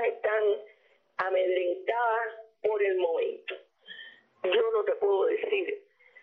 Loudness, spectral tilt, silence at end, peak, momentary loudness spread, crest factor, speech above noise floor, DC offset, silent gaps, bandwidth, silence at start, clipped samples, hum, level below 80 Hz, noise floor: -29 LUFS; 0 dB/octave; 0.45 s; -14 dBFS; 17 LU; 14 dB; 36 dB; under 0.1%; none; 4.9 kHz; 0 s; under 0.1%; none; -80 dBFS; -63 dBFS